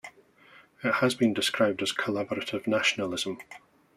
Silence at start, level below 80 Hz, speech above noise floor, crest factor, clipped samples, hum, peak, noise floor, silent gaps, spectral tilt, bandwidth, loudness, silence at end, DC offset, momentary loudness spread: 0.05 s; -72 dBFS; 29 dB; 20 dB; under 0.1%; none; -10 dBFS; -57 dBFS; none; -3.5 dB/octave; 15 kHz; -27 LUFS; 0.4 s; under 0.1%; 9 LU